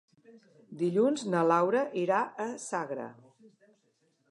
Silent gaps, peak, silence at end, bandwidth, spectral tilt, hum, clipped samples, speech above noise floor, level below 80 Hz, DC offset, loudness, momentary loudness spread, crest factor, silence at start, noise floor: none; -12 dBFS; 1.15 s; 11.5 kHz; -6 dB/octave; none; under 0.1%; 43 dB; -86 dBFS; under 0.1%; -30 LUFS; 13 LU; 20 dB; 0.3 s; -73 dBFS